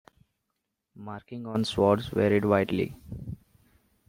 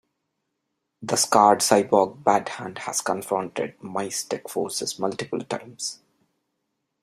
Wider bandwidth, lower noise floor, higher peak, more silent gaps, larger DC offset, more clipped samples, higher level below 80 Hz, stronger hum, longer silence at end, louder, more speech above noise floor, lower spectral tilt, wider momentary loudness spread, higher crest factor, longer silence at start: about the same, 16 kHz vs 15.5 kHz; about the same, -82 dBFS vs -79 dBFS; second, -8 dBFS vs -2 dBFS; neither; neither; neither; first, -56 dBFS vs -70 dBFS; neither; second, 0.75 s vs 1.1 s; about the same, -26 LUFS vs -24 LUFS; about the same, 55 dB vs 55 dB; first, -7 dB/octave vs -3 dB/octave; first, 18 LU vs 15 LU; about the same, 22 dB vs 24 dB; about the same, 1 s vs 1 s